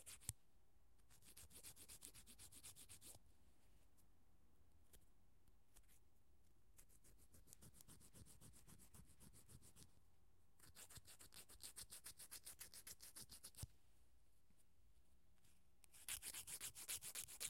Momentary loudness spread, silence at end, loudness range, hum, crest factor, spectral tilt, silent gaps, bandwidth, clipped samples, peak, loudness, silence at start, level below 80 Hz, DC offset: 16 LU; 0 s; 11 LU; none; 38 dB; -1 dB/octave; none; 16.5 kHz; under 0.1%; -24 dBFS; -57 LUFS; 0 s; -76 dBFS; under 0.1%